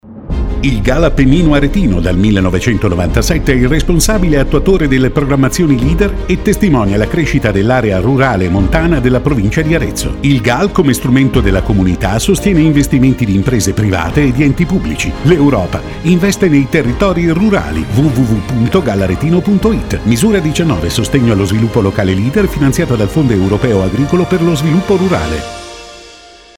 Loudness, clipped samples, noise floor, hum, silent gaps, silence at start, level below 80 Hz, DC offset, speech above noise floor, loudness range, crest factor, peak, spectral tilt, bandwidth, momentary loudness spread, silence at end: -11 LUFS; under 0.1%; -37 dBFS; none; none; 0.05 s; -20 dBFS; under 0.1%; 27 dB; 1 LU; 10 dB; 0 dBFS; -6 dB/octave; 17.5 kHz; 4 LU; 0.45 s